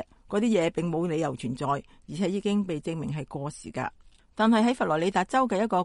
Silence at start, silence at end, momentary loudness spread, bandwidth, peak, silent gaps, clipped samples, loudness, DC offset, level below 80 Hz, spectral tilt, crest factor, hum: 0 s; 0 s; 12 LU; 11.5 kHz; -10 dBFS; none; under 0.1%; -27 LUFS; under 0.1%; -58 dBFS; -6 dB/octave; 16 dB; none